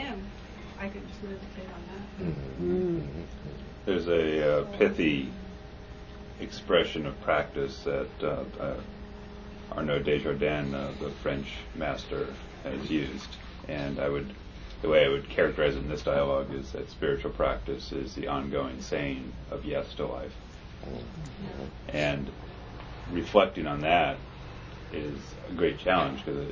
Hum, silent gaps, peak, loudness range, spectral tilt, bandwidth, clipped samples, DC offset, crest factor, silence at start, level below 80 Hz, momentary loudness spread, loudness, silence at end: none; none; -6 dBFS; 7 LU; -6.5 dB/octave; 7.4 kHz; under 0.1%; under 0.1%; 26 dB; 0 s; -44 dBFS; 18 LU; -30 LUFS; 0 s